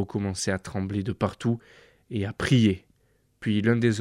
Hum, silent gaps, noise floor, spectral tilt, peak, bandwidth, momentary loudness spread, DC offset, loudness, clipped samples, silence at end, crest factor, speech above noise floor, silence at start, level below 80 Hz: none; none; -66 dBFS; -6 dB/octave; -10 dBFS; 12.5 kHz; 12 LU; under 0.1%; -27 LUFS; under 0.1%; 0 s; 16 dB; 41 dB; 0 s; -54 dBFS